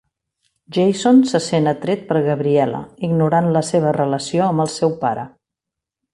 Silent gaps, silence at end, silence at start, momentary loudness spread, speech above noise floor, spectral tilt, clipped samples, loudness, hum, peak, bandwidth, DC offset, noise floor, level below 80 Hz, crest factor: none; 0.85 s; 0.7 s; 9 LU; 68 dB; -6.5 dB/octave; under 0.1%; -18 LUFS; none; -4 dBFS; 11.5 kHz; under 0.1%; -85 dBFS; -56 dBFS; 14 dB